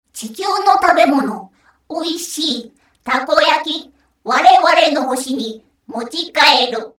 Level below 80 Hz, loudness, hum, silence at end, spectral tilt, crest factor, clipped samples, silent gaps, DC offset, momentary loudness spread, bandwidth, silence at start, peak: -58 dBFS; -14 LUFS; none; 0.1 s; -2 dB/octave; 16 dB; 0.1%; none; under 0.1%; 17 LU; 17.5 kHz; 0.15 s; 0 dBFS